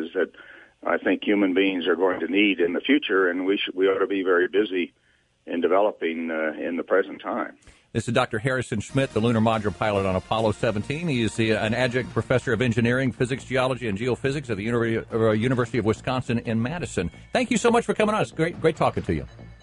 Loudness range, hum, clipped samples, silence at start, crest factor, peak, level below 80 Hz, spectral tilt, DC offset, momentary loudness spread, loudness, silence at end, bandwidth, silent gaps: 3 LU; none; under 0.1%; 0 s; 18 dB; -6 dBFS; -48 dBFS; -6 dB/octave; under 0.1%; 7 LU; -24 LUFS; 0.1 s; 11.5 kHz; none